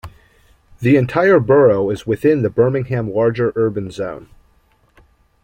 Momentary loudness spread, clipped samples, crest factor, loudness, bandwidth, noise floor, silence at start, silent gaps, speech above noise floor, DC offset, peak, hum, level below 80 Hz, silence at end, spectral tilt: 13 LU; under 0.1%; 16 dB; -16 LUFS; 15 kHz; -56 dBFS; 0.05 s; none; 41 dB; under 0.1%; -2 dBFS; none; -48 dBFS; 1.2 s; -8.5 dB/octave